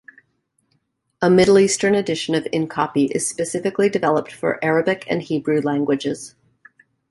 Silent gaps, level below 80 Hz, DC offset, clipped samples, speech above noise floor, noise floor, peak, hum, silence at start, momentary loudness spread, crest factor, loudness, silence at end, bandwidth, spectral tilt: none; -56 dBFS; under 0.1%; under 0.1%; 50 dB; -68 dBFS; -4 dBFS; none; 1.2 s; 9 LU; 16 dB; -19 LUFS; 0.8 s; 12 kHz; -4.5 dB/octave